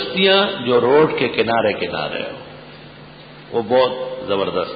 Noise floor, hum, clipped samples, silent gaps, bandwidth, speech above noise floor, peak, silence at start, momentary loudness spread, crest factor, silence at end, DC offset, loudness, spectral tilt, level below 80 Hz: -40 dBFS; none; under 0.1%; none; 5 kHz; 22 dB; -2 dBFS; 0 s; 17 LU; 16 dB; 0 s; under 0.1%; -17 LUFS; -10 dB/octave; -52 dBFS